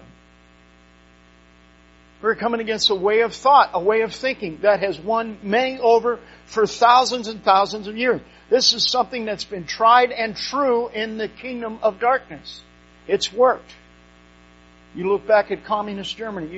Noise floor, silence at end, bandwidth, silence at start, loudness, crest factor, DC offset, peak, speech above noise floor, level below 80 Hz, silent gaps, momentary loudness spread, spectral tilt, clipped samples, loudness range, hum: -51 dBFS; 0 s; 8 kHz; 2.25 s; -20 LUFS; 20 dB; under 0.1%; 0 dBFS; 32 dB; -54 dBFS; none; 14 LU; -1 dB/octave; under 0.1%; 5 LU; 60 Hz at -50 dBFS